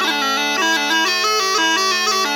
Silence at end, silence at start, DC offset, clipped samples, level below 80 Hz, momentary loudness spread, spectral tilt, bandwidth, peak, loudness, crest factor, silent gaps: 0 s; 0 s; under 0.1%; under 0.1%; -78 dBFS; 2 LU; 0.5 dB/octave; 19 kHz; -4 dBFS; -15 LUFS; 12 dB; none